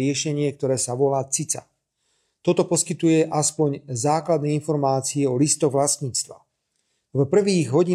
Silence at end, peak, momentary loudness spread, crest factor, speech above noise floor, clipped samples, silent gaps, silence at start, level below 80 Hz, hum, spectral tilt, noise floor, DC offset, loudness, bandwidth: 0 s; -6 dBFS; 6 LU; 16 dB; 52 dB; under 0.1%; none; 0 s; -66 dBFS; none; -5 dB/octave; -73 dBFS; under 0.1%; -22 LUFS; 14.5 kHz